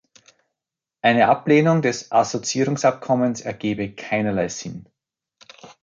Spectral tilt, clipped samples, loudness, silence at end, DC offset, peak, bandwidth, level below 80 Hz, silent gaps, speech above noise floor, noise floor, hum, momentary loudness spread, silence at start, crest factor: -5 dB/octave; under 0.1%; -20 LUFS; 0.15 s; under 0.1%; -4 dBFS; 9.4 kHz; -58 dBFS; none; 67 dB; -87 dBFS; none; 11 LU; 1.05 s; 18 dB